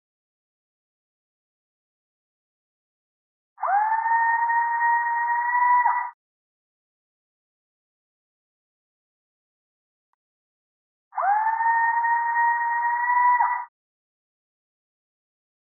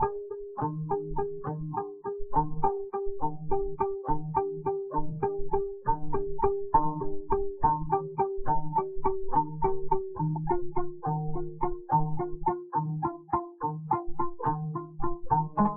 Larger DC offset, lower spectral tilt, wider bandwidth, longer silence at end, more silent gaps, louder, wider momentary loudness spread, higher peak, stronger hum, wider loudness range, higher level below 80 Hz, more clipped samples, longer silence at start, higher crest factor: neither; second, 20 dB/octave vs -6 dB/octave; about the same, 2.4 kHz vs 2.6 kHz; first, 2.15 s vs 0 s; first, 6.14-11.11 s vs none; first, -22 LUFS vs -31 LUFS; about the same, 8 LU vs 7 LU; about the same, -10 dBFS vs -10 dBFS; neither; first, 9 LU vs 3 LU; second, under -90 dBFS vs -42 dBFS; neither; first, 3.6 s vs 0 s; about the same, 16 dB vs 18 dB